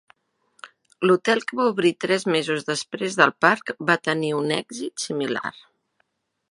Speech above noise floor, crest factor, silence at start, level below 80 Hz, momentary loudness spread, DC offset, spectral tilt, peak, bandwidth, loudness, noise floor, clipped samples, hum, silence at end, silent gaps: 49 dB; 24 dB; 0.65 s; -74 dBFS; 9 LU; under 0.1%; -4 dB/octave; 0 dBFS; 11.5 kHz; -22 LUFS; -71 dBFS; under 0.1%; none; 1 s; none